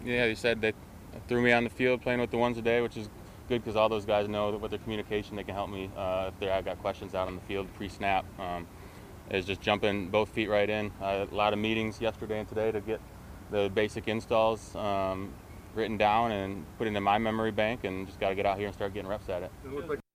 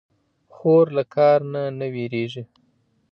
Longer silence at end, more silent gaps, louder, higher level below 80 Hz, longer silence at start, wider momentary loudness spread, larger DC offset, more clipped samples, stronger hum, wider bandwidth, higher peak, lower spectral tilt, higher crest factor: second, 0.15 s vs 0.7 s; neither; second, -31 LUFS vs -21 LUFS; first, -52 dBFS vs -72 dBFS; second, 0 s vs 0.65 s; about the same, 11 LU vs 11 LU; neither; neither; neither; first, 15.5 kHz vs 6.4 kHz; second, -10 dBFS vs -6 dBFS; second, -6 dB/octave vs -9 dB/octave; first, 22 dB vs 16 dB